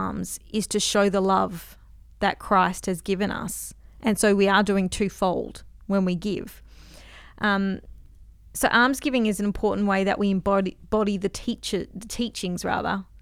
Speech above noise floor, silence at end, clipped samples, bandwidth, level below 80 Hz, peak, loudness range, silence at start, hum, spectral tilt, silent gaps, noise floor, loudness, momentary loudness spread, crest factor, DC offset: 24 dB; 0.2 s; under 0.1%; 16 kHz; -46 dBFS; -6 dBFS; 3 LU; 0 s; none; -4.5 dB/octave; none; -48 dBFS; -24 LUFS; 12 LU; 18 dB; under 0.1%